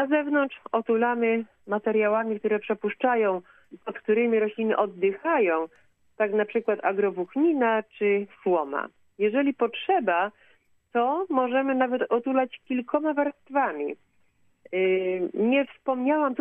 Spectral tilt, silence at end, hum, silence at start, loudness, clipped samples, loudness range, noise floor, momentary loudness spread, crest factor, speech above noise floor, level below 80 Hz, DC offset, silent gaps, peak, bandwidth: -8.5 dB/octave; 0 s; none; 0 s; -26 LUFS; under 0.1%; 2 LU; -64 dBFS; 7 LU; 16 dB; 39 dB; -78 dBFS; under 0.1%; none; -10 dBFS; 3.8 kHz